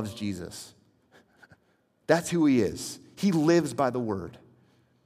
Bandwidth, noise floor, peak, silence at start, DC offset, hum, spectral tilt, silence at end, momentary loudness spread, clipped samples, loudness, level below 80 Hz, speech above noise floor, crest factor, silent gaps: 15.5 kHz; -69 dBFS; -8 dBFS; 0 s; under 0.1%; none; -5.5 dB/octave; 0.7 s; 20 LU; under 0.1%; -27 LUFS; -66 dBFS; 42 dB; 22 dB; none